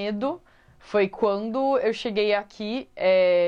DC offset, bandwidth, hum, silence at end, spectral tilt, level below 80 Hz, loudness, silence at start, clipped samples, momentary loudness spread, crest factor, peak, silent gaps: under 0.1%; 7.6 kHz; none; 0 s; -6 dB/octave; -60 dBFS; -24 LUFS; 0 s; under 0.1%; 10 LU; 12 dB; -12 dBFS; none